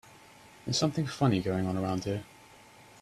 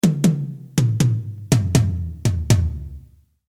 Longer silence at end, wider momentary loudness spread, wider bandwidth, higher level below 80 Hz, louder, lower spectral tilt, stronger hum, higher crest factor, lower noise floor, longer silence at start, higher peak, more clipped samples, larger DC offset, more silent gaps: second, 0.2 s vs 0.5 s; about the same, 11 LU vs 9 LU; second, 14 kHz vs 15.5 kHz; second, -62 dBFS vs -34 dBFS; second, -30 LUFS vs -20 LUFS; about the same, -5.5 dB/octave vs -6 dB/octave; neither; about the same, 18 dB vs 18 dB; first, -55 dBFS vs -47 dBFS; about the same, 0.05 s vs 0.05 s; second, -14 dBFS vs -2 dBFS; neither; neither; neither